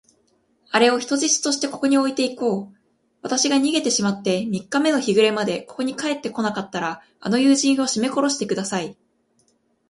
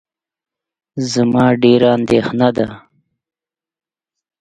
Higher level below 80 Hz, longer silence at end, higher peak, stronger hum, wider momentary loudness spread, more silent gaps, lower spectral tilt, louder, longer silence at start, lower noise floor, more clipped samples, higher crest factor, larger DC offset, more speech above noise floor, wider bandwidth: second, -66 dBFS vs -50 dBFS; second, 0.95 s vs 1.6 s; about the same, -2 dBFS vs 0 dBFS; neither; about the same, 10 LU vs 12 LU; neither; second, -3 dB/octave vs -6 dB/octave; second, -21 LUFS vs -14 LUFS; second, 0.7 s vs 0.95 s; second, -64 dBFS vs -88 dBFS; neither; about the same, 20 dB vs 16 dB; neither; second, 44 dB vs 75 dB; first, 11.5 kHz vs 9.2 kHz